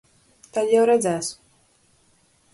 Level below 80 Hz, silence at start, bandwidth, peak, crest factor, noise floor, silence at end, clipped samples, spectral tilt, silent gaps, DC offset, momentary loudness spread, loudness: -68 dBFS; 0.55 s; 11.5 kHz; -8 dBFS; 16 dB; -61 dBFS; 1.2 s; under 0.1%; -4 dB/octave; none; under 0.1%; 13 LU; -21 LUFS